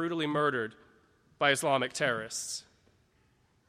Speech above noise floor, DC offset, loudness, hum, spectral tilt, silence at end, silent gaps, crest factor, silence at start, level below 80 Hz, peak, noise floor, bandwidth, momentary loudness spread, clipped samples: 38 dB; under 0.1%; -30 LUFS; none; -3 dB/octave; 1.05 s; none; 22 dB; 0 s; -74 dBFS; -10 dBFS; -69 dBFS; 16 kHz; 11 LU; under 0.1%